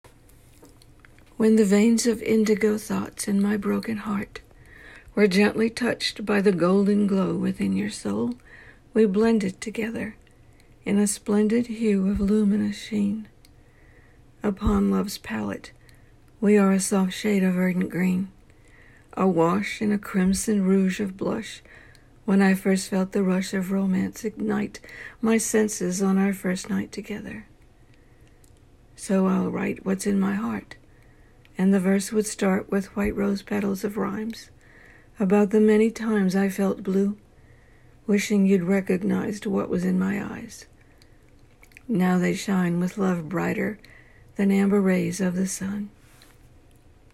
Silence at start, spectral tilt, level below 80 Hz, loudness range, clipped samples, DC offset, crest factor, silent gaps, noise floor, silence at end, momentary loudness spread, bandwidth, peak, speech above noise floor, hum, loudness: 1.4 s; -6 dB/octave; -48 dBFS; 4 LU; under 0.1%; under 0.1%; 16 dB; none; -53 dBFS; 1.25 s; 13 LU; 14 kHz; -8 dBFS; 30 dB; none; -24 LUFS